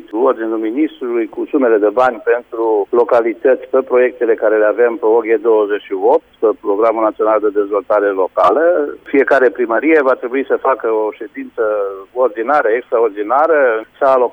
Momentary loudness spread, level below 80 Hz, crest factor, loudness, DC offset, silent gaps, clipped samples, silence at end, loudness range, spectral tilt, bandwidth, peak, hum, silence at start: 6 LU; -60 dBFS; 12 dB; -14 LUFS; under 0.1%; none; under 0.1%; 0 s; 2 LU; -6.5 dB/octave; 5.2 kHz; -2 dBFS; none; 0.1 s